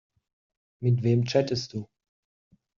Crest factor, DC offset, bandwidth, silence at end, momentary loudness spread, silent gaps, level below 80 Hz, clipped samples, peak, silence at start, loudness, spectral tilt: 20 dB; under 0.1%; 7.2 kHz; 0.95 s; 12 LU; none; -64 dBFS; under 0.1%; -8 dBFS; 0.8 s; -26 LUFS; -7 dB/octave